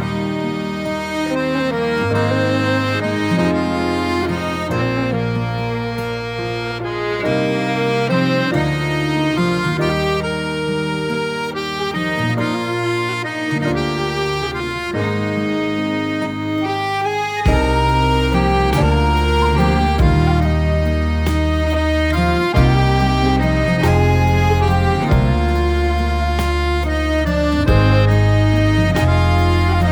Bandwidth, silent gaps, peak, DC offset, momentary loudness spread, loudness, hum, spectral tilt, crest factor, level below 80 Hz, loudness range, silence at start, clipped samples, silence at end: 19.5 kHz; none; -2 dBFS; under 0.1%; 7 LU; -17 LUFS; none; -6.5 dB/octave; 16 dB; -24 dBFS; 5 LU; 0 s; under 0.1%; 0 s